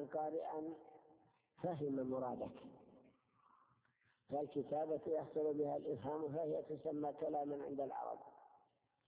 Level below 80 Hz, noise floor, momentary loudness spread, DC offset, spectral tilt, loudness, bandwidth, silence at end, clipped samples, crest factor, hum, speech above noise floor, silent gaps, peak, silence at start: -82 dBFS; -80 dBFS; 10 LU; under 0.1%; -8 dB/octave; -44 LUFS; 4 kHz; 0.5 s; under 0.1%; 16 dB; none; 37 dB; none; -30 dBFS; 0 s